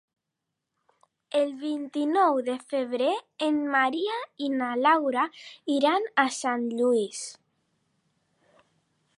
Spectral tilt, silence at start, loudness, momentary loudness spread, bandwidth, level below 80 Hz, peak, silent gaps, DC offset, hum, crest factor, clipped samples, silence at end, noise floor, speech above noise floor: -3 dB/octave; 1.35 s; -26 LUFS; 9 LU; 11.5 kHz; -84 dBFS; -8 dBFS; none; under 0.1%; none; 20 dB; under 0.1%; 1.85 s; -84 dBFS; 58 dB